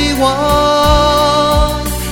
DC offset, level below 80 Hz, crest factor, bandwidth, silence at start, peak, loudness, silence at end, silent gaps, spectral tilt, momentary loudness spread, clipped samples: under 0.1%; -20 dBFS; 12 dB; 18.5 kHz; 0 s; 0 dBFS; -11 LUFS; 0 s; none; -4.5 dB/octave; 4 LU; under 0.1%